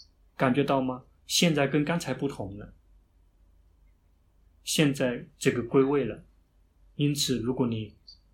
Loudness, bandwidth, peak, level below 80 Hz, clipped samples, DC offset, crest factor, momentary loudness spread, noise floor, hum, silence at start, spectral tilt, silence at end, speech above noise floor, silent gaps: -27 LUFS; 17 kHz; -10 dBFS; -58 dBFS; under 0.1%; under 0.1%; 20 dB; 16 LU; -64 dBFS; none; 0.4 s; -4.5 dB/octave; 0.2 s; 37 dB; none